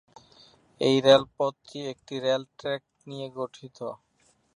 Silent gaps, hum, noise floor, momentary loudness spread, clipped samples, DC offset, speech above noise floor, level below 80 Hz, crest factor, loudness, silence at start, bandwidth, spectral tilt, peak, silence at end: none; none; -67 dBFS; 19 LU; under 0.1%; under 0.1%; 41 dB; -68 dBFS; 24 dB; -26 LUFS; 0.8 s; 10.5 kHz; -5 dB/octave; -4 dBFS; 0.6 s